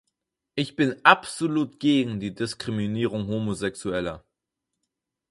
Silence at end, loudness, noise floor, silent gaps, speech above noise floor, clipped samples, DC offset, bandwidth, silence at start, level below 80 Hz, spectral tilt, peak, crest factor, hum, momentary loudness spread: 1.1 s; -25 LUFS; -84 dBFS; none; 59 dB; under 0.1%; under 0.1%; 11.5 kHz; 0.55 s; -56 dBFS; -5 dB/octave; 0 dBFS; 26 dB; none; 12 LU